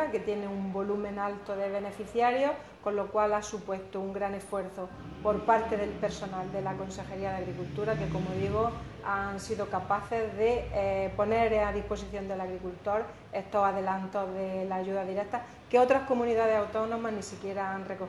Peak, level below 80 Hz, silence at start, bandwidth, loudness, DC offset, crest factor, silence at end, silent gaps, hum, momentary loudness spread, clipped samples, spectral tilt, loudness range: -12 dBFS; -52 dBFS; 0 s; 12 kHz; -31 LUFS; under 0.1%; 20 dB; 0 s; none; none; 10 LU; under 0.1%; -6 dB/octave; 3 LU